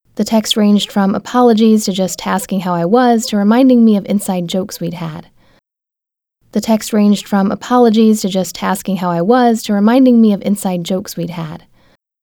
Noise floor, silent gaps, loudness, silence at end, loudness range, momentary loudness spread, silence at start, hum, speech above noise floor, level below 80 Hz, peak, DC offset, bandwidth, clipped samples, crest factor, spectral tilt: -84 dBFS; none; -13 LUFS; 0.65 s; 6 LU; 13 LU; 0.15 s; none; 72 dB; -54 dBFS; 0 dBFS; under 0.1%; 19 kHz; under 0.1%; 14 dB; -5.5 dB/octave